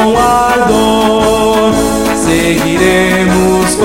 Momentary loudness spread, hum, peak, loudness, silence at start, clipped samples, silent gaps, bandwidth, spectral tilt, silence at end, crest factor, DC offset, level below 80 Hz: 2 LU; none; 0 dBFS; -9 LUFS; 0 s; under 0.1%; none; 17 kHz; -4.5 dB/octave; 0 s; 10 dB; 0.7%; -28 dBFS